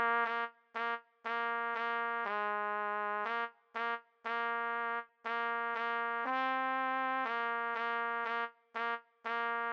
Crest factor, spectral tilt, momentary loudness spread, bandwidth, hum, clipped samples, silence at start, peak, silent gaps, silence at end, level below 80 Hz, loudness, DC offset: 16 dB; -4 dB/octave; 6 LU; 7 kHz; none; under 0.1%; 0 s; -20 dBFS; none; 0 s; under -90 dBFS; -36 LUFS; under 0.1%